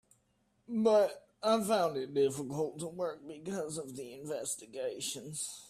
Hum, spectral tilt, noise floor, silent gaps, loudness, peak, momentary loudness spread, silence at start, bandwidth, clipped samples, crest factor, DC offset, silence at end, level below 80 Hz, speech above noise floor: none; -4 dB/octave; -74 dBFS; none; -34 LUFS; -16 dBFS; 12 LU; 0.7 s; 15.5 kHz; under 0.1%; 18 dB; under 0.1%; 0 s; -76 dBFS; 41 dB